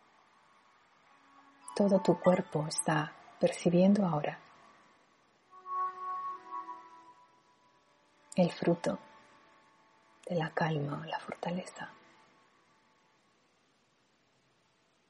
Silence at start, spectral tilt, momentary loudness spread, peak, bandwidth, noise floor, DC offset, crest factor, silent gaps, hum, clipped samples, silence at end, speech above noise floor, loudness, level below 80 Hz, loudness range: 1.65 s; -6 dB/octave; 19 LU; -12 dBFS; 10.5 kHz; -72 dBFS; under 0.1%; 24 dB; none; none; under 0.1%; 3.2 s; 41 dB; -32 LUFS; -78 dBFS; 13 LU